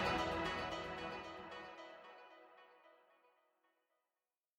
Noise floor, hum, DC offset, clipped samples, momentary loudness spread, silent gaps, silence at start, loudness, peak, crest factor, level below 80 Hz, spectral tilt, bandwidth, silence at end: under -90 dBFS; none; under 0.1%; under 0.1%; 23 LU; none; 0 s; -44 LUFS; -26 dBFS; 20 dB; -64 dBFS; -4.5 dB/octave; 18 kHz; 1.65 s